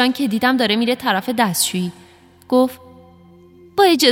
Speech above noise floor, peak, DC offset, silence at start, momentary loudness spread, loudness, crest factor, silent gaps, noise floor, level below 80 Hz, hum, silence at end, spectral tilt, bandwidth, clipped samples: 29 dB; -2 dBFS; under 0.1%; 0 s; 7 LU; -17 LUFS; 18 dB; none; -46 dBFS; -62 dBFS; none; 0 s; -3.5 dB/octave; 18 kHz; under 0.1%